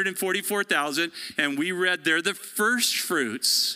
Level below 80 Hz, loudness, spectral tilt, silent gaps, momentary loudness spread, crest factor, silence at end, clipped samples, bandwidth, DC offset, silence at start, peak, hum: -78 dBFS; -24 LUFS; -1.5 dB/octave; none; 5 LU; 18 dB; 0 s; under 0.1%; 16 kHz; under 0.1%; 0 s; -8 dBFS; none